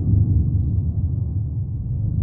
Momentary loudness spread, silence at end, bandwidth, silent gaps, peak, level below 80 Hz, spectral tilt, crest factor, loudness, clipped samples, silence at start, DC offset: 8 LU; 0 s; 1.2 kHz; none; -6 dBFS; -26 dBFS; -16.5 dB/octave; 14 dB; -22 LUFS; under 0.1%; 0 s; under 0.1%